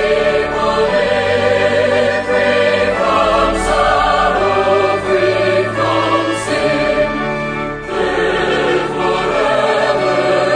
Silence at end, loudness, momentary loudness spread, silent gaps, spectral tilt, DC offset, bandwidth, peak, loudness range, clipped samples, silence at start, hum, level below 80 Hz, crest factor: 0 s; -14 LUFS; 4 LU; none; -4.5 dB/octave; under 0.1%; 10 kHz; -2 dBFS; 3 LU; under 0.1%; 0 s; none; -34 dBFS; 12 dB